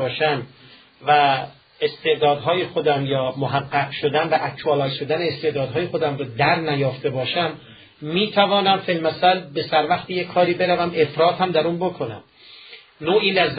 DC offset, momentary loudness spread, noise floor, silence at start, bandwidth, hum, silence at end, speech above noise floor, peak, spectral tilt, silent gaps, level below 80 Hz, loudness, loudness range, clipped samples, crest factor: under 0.1%; 9 LU; -44 dBFS; 0 s; 5 kHz; none; 0 s; 24 dB; -4 dBFS; -10.5 dB/octave; none; -60 dBFS; -20 LUFS; 3 LU; under 0.1%; 18 dB